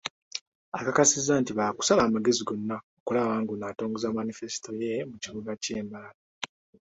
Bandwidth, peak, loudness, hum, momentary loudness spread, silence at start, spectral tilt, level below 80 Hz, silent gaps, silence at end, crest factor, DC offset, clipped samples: 8.2 kHz; -8 dBFS; -28 LUFS; none; 17 LU; 0.05 s; -3.5 dB/octave; -64 dBFS; 0.10-0.31 s, 0.41-0.72 s, 2.83-3.06 s, 6.14-6.41 s; 0.4 s; 20 dB; under 0.1%; under 0.1%